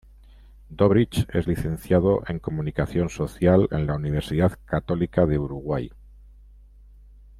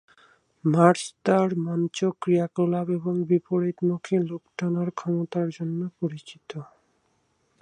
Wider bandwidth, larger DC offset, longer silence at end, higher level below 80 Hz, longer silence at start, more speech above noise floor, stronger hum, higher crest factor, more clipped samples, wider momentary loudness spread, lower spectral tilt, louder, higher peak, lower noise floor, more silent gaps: first, 15 kHz vs 11 kHz; neither; first, 1.5 s vs 0.95 s; first, -42 dBFS vs -72 dBFS; about the same, 0.7 s vs 0.65 s; second, 26 dB vs 45 dB; first, 50 Hz at -40 dBFS vs none; second, 18 dB vs 24 dB; neither; second, 9 LU vs 12 LU; about the same, -8 dB/octave vs -7 dB/octave; about the same, -24 LUFS vs -25 LUFS; second, -6 dBFS vs -2 dBFS; second, -49 dBFS vs -69 dBFS; neither